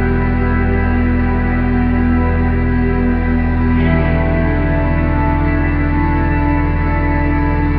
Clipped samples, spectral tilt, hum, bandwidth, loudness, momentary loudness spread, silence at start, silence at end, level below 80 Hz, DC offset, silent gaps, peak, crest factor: under 0.1%; -12 dB/octave; none; 4.8 kHz; -15 LUFS; 1 LU; 0 s; 0 s; -18 dBFS; under 0.1%; none; -2 dBFS; 12 dB